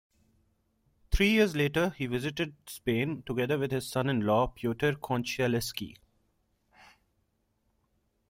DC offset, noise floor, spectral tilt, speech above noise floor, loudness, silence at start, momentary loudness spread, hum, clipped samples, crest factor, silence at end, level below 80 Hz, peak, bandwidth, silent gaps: under 0.1%; -75 dBFS; -5.5 dB/octave; 46 dB; -30 LUFS; 1.1 s; 11 LU; none; under 0.1%; 20 dB; 2.35 s; -44 dBFS; -12 dBFS; 16 kHz; none